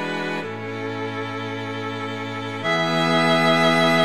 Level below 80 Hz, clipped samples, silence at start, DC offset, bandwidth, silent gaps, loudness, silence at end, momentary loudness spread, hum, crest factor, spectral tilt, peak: -66 dBFS; under 0.1%; 0 s; 0.4%; 14.5 kHz; none; -22 LUFS; 0 s; 12 LU; none; 16 dB; -5 dB/octave; -6 dBFS